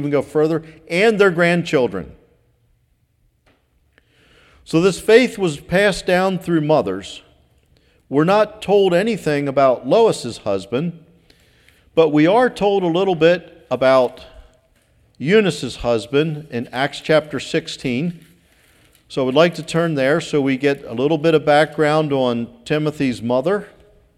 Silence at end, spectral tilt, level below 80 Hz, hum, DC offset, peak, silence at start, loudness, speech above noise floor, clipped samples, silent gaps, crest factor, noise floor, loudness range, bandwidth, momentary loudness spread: 0.5 s; -6 dB/octave; -50 dBFS; none; under 0.1%; 0 dBFS; 0 s; -17 LUFS; 45 dB; under 0.1%; none; 18 dB; -62 dBFS; 4 LU; 13.5 kHz; 10 LU